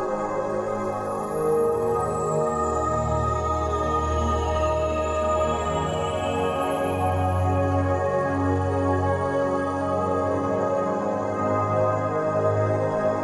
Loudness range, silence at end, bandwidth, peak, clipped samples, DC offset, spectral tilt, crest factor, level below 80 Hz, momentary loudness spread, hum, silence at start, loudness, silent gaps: 1 LU; 0 s; 12 kHz; -8 dBFS; under 0.1%; under 0.1%; -7 dB/octave; 14 dB; -38 dBFS; 3 LU; none; 0 s; -24 LUFS; none